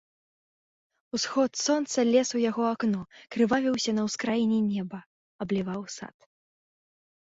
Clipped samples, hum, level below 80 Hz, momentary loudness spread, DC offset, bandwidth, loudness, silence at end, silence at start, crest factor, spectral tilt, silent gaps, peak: under 0.1%; none; -68 dBFS; 15 LU; under 0.1%; 8 kHz; -27 LUFS; 1.3 s; 1.15 s; 18 dB; -4.5 dB/octave; 5.06-5.39 s; -12 dBFS